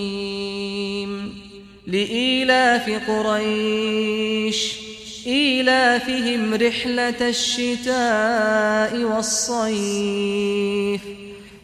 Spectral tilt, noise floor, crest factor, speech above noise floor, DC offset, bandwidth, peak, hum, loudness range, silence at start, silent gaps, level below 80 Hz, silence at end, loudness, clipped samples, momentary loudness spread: -3 dB/octave; -41 dBFS; 16 dB; 21 dB; under 0.1%; 15 kHz; -4 dBFS; none; 2 LU; 0 s; none; -54 dBFS; 0.05 s; -20 LUFS; under 0.1%; 12 LU